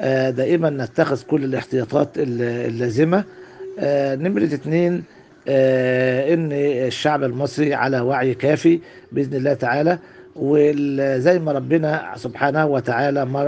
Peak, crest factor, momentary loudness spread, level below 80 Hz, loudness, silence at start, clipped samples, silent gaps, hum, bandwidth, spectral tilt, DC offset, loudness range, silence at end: -2 dBFS; 18 dB; 6 LU; -62 dBFS; -19 LUFS; 0 s; under 0.1%; none; none; 9 kHz; -7.5 dB/octave; under 0.1%; 2 LU; 0 s